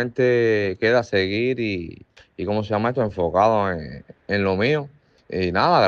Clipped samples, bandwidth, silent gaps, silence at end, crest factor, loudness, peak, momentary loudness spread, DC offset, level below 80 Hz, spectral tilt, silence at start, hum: under 0.1%; 7 kHz; none; 0 s; 18 dB; -21 LUFS; -4 dBFS; 13 LU; under 0.1%; -54 dBFS; -7 dB/octave; 0 s; none